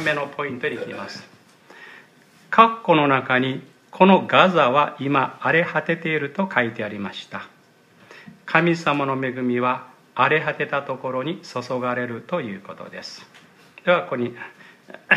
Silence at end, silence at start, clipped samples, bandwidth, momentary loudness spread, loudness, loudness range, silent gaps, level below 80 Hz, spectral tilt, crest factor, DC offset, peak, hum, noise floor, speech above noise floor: 0 s; 0 s; under 0.1%; 11.5 kHz; 19 LU; -21 LUFS; 9 LU; none; -72 dBFS; -6 dB/octave; 22 dB; under 0.1%; 0 dBFS; none; -54 dBFS; 33 dB